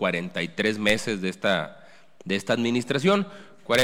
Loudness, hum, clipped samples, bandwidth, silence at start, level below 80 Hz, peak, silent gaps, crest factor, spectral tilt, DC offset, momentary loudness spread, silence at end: -25 LUFS; none; under 0.1%; 17 kHz; 0 s; -58 dBFS; -8 dBFS; none; 18 dB; -4.5 dB/octave; under 0.1%; 13 LU; 0 s